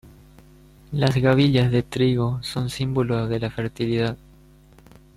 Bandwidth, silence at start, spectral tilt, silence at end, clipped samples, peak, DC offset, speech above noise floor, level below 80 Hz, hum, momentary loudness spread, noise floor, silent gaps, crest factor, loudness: 13 kHz; 0.05 s; -7 dB/octave; 1 s; under 0.1%; -6 dBFS; under 0.1%; 29 dB; -46 dBFS; none; 10 LU; -50 dBFS; none; 16 dB; -22 LUFS